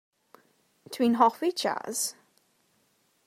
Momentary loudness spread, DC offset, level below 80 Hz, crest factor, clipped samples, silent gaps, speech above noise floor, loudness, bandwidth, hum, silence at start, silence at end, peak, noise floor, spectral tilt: 9 LU; under 0.1%; -86 dBFS; 24 dB; under 0.1%; none; 43 dB; -27 LUFS; 16 kHz; none; 0.9 s; 1.15 s; -8 dBFS; -70 dBFS; -2.5 dB/octave